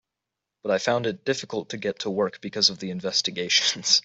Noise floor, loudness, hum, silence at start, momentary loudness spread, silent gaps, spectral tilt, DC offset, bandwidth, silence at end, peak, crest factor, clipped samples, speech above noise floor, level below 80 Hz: -85 dBFS; -24 LUFS; none; 0.65 s; 10 LU; none; -2 dB/octave; under 0.1%; 8.2 kHz; 0.05 s; -4 dBFS; 22 dB; under 0.1%; 60 dB; -70 dBFS